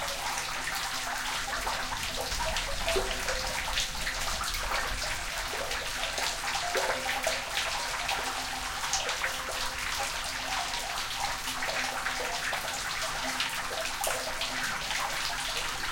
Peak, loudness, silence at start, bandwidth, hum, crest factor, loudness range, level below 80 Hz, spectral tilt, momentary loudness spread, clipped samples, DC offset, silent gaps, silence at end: -12 dBFS; -31 LUFS; 0 s; 17 kHz; none; 20 dB; 1 LU; -44 dBFS; -1 dB/octave; 3 LU; under 0.1%; under 0.1%; none; 0 s